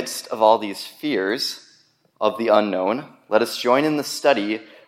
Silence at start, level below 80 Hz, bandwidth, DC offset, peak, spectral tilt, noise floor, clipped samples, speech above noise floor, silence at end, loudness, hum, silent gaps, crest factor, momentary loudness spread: 0 s; -76 dBFS; 16.5 kHz; under 0.1%; -2 dBFS; -3.5 dB/octave; -58 dBFS; under 0.1%; 38 dB; 0.25 s; -21 LUFS; none; none; 20 dB; 10 LU